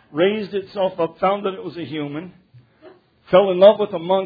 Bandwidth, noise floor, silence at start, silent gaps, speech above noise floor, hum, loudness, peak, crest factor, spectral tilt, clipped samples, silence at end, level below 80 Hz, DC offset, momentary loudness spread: 5 kHz; -48 dBFS; 0.15 s; none; 30 dB; none; -19 LUFS; 0 dBFS; 20 dB; -9 dB/octave; under 0.1%; 0 s; -62 dBFS; under 0.1%; 16 LU